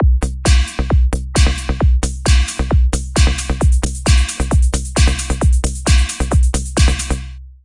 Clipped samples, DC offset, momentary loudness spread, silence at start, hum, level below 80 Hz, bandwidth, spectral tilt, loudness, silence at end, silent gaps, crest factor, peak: under 0.1%; under 0.1%; 2 LU; 0 s; none; -16 dBFS; 11.5 kHz; -4.5 dB/octave; -16 LUFS; 0.1 s; none; 14 dB; 0 dBFS